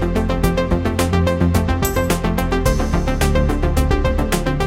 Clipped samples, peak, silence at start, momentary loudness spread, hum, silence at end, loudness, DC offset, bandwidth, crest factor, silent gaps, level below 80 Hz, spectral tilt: under 0.1%; -4 dBFS; 0 s; 2 LU; none; 0 s; -18 LUFS; under 0.1%; 16.5 kHz; 12 dB; none; -22 dBFS; -6 dB/octave